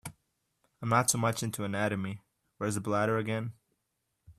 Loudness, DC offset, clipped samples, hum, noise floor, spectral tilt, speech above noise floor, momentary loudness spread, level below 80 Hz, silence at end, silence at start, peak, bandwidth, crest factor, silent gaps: -31 LUFS; under 0.1%; under 0.1%; none; -81 dBFS; -4.5 dB/octave; 51 dB; 14 LU; -68 dBFS; 0.05 s; 0.05 s; -10 dBFS; 15.5 kHz; 22 dB; none